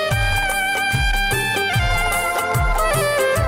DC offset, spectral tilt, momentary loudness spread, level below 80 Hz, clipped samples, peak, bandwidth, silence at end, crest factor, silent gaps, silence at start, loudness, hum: under 0.1%; -3.5 dB/octave; 2 LU; -26 dBFS; under 0.1%; -8 dBFS; 16.5 kHz; 0 s; 10 dB; none; 0 s; -18 LUFS; none